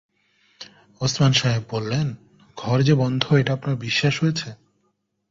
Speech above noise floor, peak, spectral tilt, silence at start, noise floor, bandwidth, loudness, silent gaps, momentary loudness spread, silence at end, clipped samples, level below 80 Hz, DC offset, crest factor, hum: 50 dB; 0 dBFS; -5.5 dB/octave; 0.6 s; -71 dBFS; 7.6 kHz; -21 LUFS; none; 24 LU; 0.75 s; under 0.1%; -54 dBFS; under 0.1%; 22 dB; none